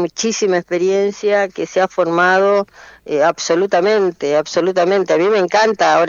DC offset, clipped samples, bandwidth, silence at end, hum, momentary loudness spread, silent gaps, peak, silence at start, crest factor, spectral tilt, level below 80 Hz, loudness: under 0.1%; under 0.1%; 7.6 kHz; 0 s; none; 5 LU; none; 0 dBFS; 0 s; 14 dB; -4 dB/octave; -60 dBFS; -15 LUFS